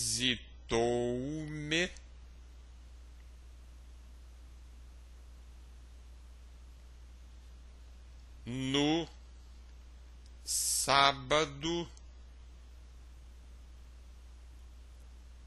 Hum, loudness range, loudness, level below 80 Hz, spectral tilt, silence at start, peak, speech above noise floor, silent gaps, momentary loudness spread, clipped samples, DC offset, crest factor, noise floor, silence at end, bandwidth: none; 23 LU; -32 LUFS; -52 dBFS; -3 dB/octave; 0 s; -10 dBFS; 20 dB; none; 25 LU; under 0.1%; under 0.1%; 28 dB; -52 dBFS; 0 s; 12 kHz